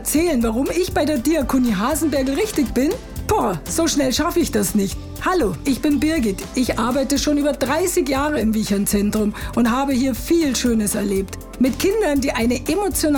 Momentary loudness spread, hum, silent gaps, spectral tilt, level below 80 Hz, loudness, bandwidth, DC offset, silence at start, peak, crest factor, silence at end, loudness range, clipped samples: 4 LU; none; none; -4.5 dB/octave; -34 dBFS; -19 LUFS; over 20 kHz; under 0.1%; 0 s; -8 dBFS; 10 dB; 0 s; 1 LU; under 0.1%